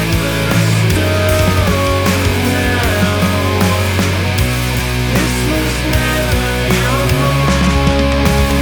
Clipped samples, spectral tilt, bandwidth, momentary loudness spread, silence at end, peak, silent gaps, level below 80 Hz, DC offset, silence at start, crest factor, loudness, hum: under 0.1%; -5 dB/octave; over 20 kHz; 2 LU; 0 s; 0 dBFS; none; -22 dBFS; 0.5%; 0 s; 12 dB; -13 LUFS; none